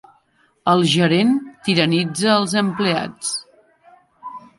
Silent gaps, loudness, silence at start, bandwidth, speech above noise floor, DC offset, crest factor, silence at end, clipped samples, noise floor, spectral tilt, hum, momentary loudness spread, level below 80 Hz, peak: none; -18 LUFS; 0.65 s; 11.5 kHz; 43 dB; under 0.1%; 18 dB; 0.2 s; under 0.1%; -60 dBFS; -4.5 dB/octave; none; 12 LU; -62 dBFS; -2 dBFS